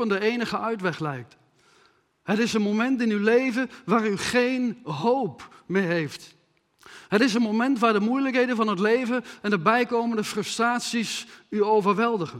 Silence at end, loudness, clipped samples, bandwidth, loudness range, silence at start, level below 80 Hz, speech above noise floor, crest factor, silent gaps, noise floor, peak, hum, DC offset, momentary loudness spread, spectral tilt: 0 s; -24 LUFS; under 0.1%; 14.5 kHz; 3 LU; 0 s; -68 dBFS; 38 dB; 20 dB; none; -62 dBFS; -4 dBFS; none; under 0.1%; 8 LU; -5 dB/octave